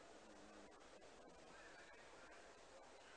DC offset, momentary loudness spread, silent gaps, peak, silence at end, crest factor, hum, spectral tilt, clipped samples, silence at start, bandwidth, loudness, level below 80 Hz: under 0.1%; 2 LU; none; -50 dBFS; 0 s; 12 dB; none; -2.5 dB/octave; under 0.1%; 0 s; 10 kHz; -63 LUFS; -80 dBFS